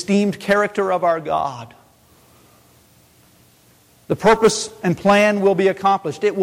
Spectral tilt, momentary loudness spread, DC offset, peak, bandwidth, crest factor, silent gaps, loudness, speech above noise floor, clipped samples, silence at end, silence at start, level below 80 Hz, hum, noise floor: -5 dB/octave; 8 LU; under 0.1%; -4 dBFS; 16.5 kHz; 14 dB; none; -18 LUFS; 36 dB; under 0.1%; 0 s; 0 s; -52 dBFS; none; -53 dBFS